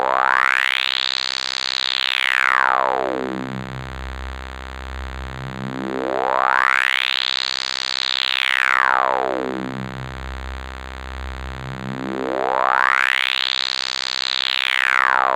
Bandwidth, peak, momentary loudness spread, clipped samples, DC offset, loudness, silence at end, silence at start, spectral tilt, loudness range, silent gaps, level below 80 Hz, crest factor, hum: 17 kHz; 0 dBFS; 16 LU; under 0.1%; 0.1%; -18 LUFS; 0 s; 0 s; -3 dB/octave; 9 LU; none; -38 dBFS; 20 dB; none